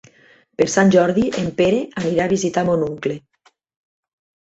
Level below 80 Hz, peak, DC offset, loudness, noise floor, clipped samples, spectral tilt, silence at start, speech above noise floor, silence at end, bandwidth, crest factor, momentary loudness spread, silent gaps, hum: -52 dBFS; -2 dBFS; under 0.1%; -18 LUFS; -52 dBFS; under 0.1%; -5.5 dB/octave; 0.6 s; 35 dB; 1.25 s; 8.2 kHz; 18 dB; 12 LU; none; none